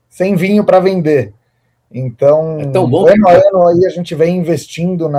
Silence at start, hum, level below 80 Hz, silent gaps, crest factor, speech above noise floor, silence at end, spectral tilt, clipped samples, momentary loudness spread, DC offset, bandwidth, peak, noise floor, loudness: 0.2 s; none; -48 dBFS; none; 10 dB; 50 dB; 0 s; -7.5 dB/octave; under 0.1%; 11 LU; under 0.1%; 15 kHz; 0 dBFS; -60 dBFS; -11 LUFS